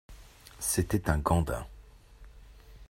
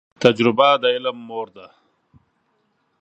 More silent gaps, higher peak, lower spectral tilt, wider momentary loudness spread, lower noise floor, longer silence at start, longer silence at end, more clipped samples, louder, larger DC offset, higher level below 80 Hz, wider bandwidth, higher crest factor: neither; second, -10 dBFS vs 0 dBFS; about the same, -5 dB/octave vs -5.5 dB/octave; first, 23 LU vs 16 LU; second, -52 dBFS vs -67 dBFS; about the same, 0.1 s vs 0.2 s; second, 0.05 s vs 1.35 s; neither; second, -30 LUFS vs -17 LUFS; neither; first, -42 dBFS vs -66 dBFS; first, 16 kHz vs 8.4 kHz; about the same, 22 dB vs 20 dB